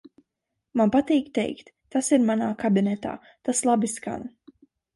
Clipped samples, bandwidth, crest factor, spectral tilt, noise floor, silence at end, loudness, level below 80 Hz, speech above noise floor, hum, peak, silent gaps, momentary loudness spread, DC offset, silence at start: under 0.1%; 11.5 kHz; 16 dB; -5 dB/octave; -82 dBFS; 0.7 s; -24 LUFS; -62 dBFS; 59 dB; none; -8 dBFS; none; 13 LU; under 0.1%; 0.75 s